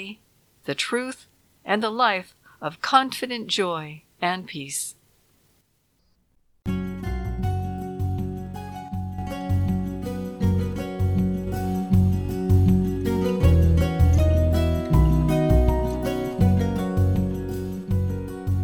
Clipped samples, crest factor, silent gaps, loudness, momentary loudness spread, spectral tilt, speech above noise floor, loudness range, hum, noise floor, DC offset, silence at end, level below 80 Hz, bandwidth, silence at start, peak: under 0.1%; 20 dB; none; -24 LUFS; 12 LU; -6.5 dB/octave; 41 dB; 11 LU; none; -66 dBFS; under 0.1%; 0 s; -30 dBFS; 16 kHz; 0 s; -4 dBFS